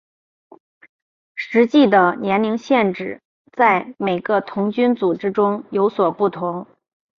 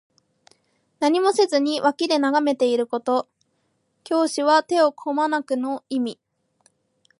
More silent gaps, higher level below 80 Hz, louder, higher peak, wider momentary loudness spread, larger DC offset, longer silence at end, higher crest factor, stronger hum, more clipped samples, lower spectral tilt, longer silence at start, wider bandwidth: first, 3.25-3.45 s vs none; first, -64 dBFS vs -80 dBFS; first, -18 LUFS vs -21 LUFS; about the same, -2 dBFS vs -4 dBFS; first, 16 LU vs 8 LU; neither; second, 0.55 s vs 1.05 s; about the same, 18 dB vs 18 dB; neither; neither; first, -7 dB/octave vs -3 dB/octave; first, 1.35 s vs 1 s; second, 7 kHz vs 11.5 kHz